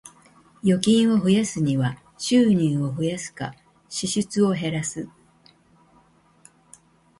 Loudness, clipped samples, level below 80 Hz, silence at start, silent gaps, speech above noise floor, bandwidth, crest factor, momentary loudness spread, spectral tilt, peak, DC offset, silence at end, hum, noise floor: -22 LUFS; under 0.1%; -60 dBFS; 0.05 s; none; 37 dB; 11.5 kHz; 20 dB; 14 LU; -5.5 dB/octave; -2 dBFS; under 0.1%; 2.1 s; none; -58 dBFS